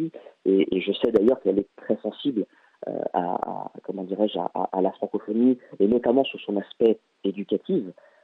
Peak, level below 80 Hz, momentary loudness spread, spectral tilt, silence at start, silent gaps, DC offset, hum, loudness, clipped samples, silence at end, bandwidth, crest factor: -8 dBFS; -64 dBFS; 12 LU; -9 dB/octave; 0 s; none; under 0.1%; none; -25 LUFS; under 0.1%; 0.3 s; 4.4 kHz; 18 dB